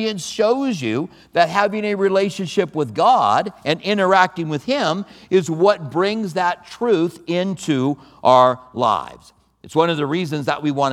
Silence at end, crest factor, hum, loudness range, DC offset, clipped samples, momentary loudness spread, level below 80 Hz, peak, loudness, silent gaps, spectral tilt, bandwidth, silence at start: 0 s; 18 dB; none; 2 LU; under 0.1%; under 0.1%; 8 LU; -62 dBFS; 0 dBFS; -19 LUFS; none; -5.5 dB/octave; 14.5 kHz; 0 s